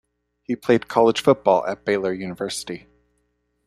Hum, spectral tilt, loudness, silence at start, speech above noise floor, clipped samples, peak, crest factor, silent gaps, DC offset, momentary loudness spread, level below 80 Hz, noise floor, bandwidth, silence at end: 60 Hz at -50 dBFS; -5 dB/octave; -21 LUFS; 0.5 s; 50 dB; under 0.1%; -2 dBFS; 20 dB; none; under 0.1%; 13 LU; -60 dBFS; -70 dBFS; 14.5 kHz; 0.9 s